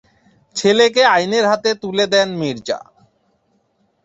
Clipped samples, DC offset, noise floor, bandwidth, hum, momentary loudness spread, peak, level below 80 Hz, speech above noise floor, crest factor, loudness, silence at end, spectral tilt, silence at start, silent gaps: under 0.1%; under 0.1%; -63 dBFS; 8 kHz; none; 13 LU; 0 dBFS; -62 dBFS; 47 dB; 18 dB; -16 LUFS; 1.25 s; -3.5 dB/octave; 0.55 s; none